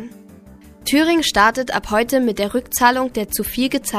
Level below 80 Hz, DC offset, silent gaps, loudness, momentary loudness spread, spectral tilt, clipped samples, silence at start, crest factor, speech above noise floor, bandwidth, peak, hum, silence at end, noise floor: -42 dBFS; under 0.1%; none; -17 LUFS; 7 LU; -3 dB/octave; under 0.1%; 0 s; 18 dB; 25 dB; 15.5 kHz; 0 dBFS; none; 0 s; -43 dBFS